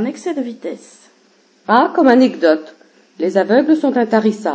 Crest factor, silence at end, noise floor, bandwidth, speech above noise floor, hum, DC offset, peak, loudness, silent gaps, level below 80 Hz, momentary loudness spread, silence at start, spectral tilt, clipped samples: 16 dB; 0 s; -53 dBFS; 8 kHz; 39 dB; none; under 0.1%; 0 dBFS; -14 LUFS; none; -72 dBFS; 16 LU; 0 s; -6 dB/octave; under 0.1%